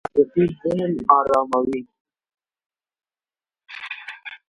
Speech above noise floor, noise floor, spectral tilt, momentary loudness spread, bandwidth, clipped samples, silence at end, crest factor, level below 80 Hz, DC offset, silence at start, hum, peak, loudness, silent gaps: over 71 dB; under -90 dBFS; -7.5 dB/octave; 17 LU; 11 kHz; under 0.1%; 0.15 s; 22 dB; -58 dBFS; under 0.1%; 0.15 s; none; -2 dBFS; -20 LUFS; 2.00-2.05 s